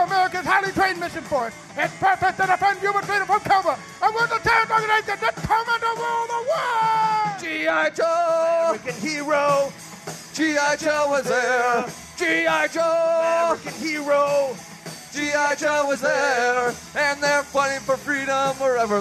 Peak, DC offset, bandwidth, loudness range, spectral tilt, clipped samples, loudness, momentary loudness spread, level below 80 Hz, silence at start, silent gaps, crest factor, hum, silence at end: -6 dBFS; under 0.1%; 13.5 kHz; 2 LU; -3 dB/octave; under 0.1%; -21 LUFS; 7 LU; -56 dBFS; 0 s; none; 16 dB; none; 0 s